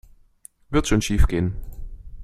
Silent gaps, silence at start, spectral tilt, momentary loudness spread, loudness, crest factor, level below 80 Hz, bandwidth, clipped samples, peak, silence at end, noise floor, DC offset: none; 0.7 s; -5.5 dB/octave; 21 LU; -23 LUFS; 18 dB; -26 dBFS; 14 kHz; under 0.1%; -4 dBFS; 0 s; -51 dBFS; under 0.1%